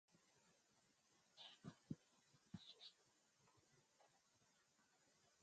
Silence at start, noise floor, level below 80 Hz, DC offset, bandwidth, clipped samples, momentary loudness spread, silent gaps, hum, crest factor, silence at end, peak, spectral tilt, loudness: 0.1 s; -81 dBFS; -90 dBFS; under 0.1%; 8.8 kHz; under 0.1%; 5 LU; none; none; 28 dB; 0 s; -38 dBFS; -4.5 dB/octave; -62 LUFS